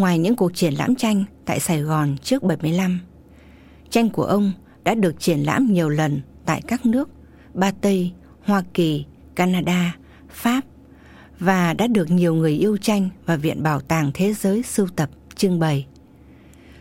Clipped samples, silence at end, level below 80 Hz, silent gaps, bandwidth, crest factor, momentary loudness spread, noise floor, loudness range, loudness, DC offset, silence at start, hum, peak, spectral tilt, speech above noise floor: under 0.1%; 0.95 s; -50 dBFS; none; 16.5 kHz; 16 dB; 7 LU; -47 dBFS; 2 LU; -21 LUFS; under 0.1%; 0 s; none; -4 dBFS; -6 dB/octave; 27 dB